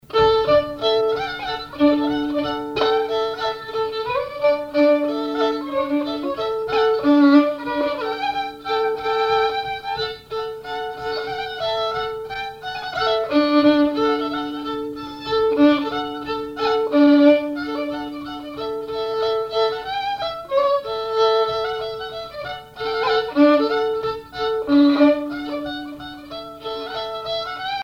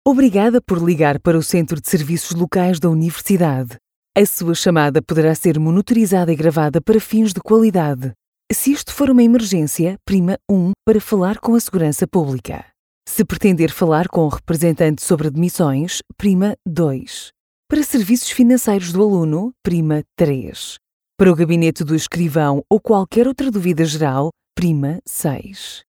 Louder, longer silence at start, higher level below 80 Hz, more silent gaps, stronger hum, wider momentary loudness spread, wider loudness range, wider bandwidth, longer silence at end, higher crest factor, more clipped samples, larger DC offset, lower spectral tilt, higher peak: second, -20 LUFS vs -16 LUFS; about the same, 0.1 s vs 0.05 s; second, -52 dBFS vs -46 dBFS; second, none vs 3.96-4.03 s, 8.27-8.33 s, 12.79-13.02 s, 17.40-17.63 s, 20.93-21.01 s; neither; first, 13 LU vs 8 LU; first, 5 LU vs 2 LU; second, 7.2 kHz vs 19.5 kHz; about the same, 0 s vs 0.1 s; about the same, 16 dB vs 14 dB; neither; neither; about the same, -5.5 dB/octave vs -6 dB/octave; about the same, -4 dBFS vs -2 dBFS